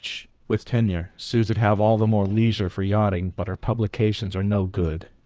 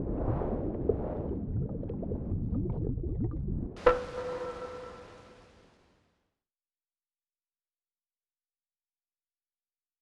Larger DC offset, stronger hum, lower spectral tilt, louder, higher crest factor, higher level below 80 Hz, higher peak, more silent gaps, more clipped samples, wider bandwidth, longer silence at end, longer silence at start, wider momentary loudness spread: neither; neither; about the same, -8 dB/octave vs -8.5 dB/octave; first, -23 LUFS vs -34 LUFS; second, 14 dB vs 28 dB; first, -38 dBFS vs -44 dBFS; about the same, -8 dBFS vs -8 dBFS; neither; neither; second, 8 kHz vs 9.8 kHz; second, 0.2 s vs 4.55 s; about the same, 0.05 s vs 0 s; second, 9 LU vs 15 LU